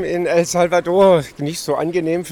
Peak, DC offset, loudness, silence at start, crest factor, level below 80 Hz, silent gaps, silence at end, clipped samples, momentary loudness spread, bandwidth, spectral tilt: -4 dBFS; under 0.1%; -17 LUFS; 0 s; 14 dB; -50 dBFS; none; 0 s; under 0.1%; 8 LU; 19 kHz; -5 dB/octave